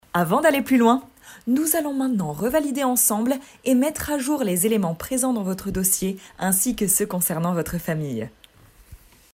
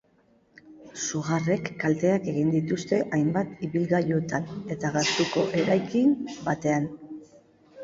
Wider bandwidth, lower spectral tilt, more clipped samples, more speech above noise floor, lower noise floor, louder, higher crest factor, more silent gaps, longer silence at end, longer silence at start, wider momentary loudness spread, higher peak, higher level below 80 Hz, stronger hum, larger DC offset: first, 16 kHz vs 7.8 kHz; about the same, -4.5 dB/octave vs -5.5 dB/octave; neither; second, 30 dB vs 38 dB; second, -51 dBFS vs -63 dBFS; first, -22 LUFS vs -26 LUFS; about the same, 18 dB vs 16 dB; neither; first, 0.4 s vs 0 s; second, 0.15 s vs 0.65 s; about the same, 8 LU vs 8 LU; first, -4 dBFS vs -10 dBFS; first, -48 dBFS vs -62 dBFS; neither; neither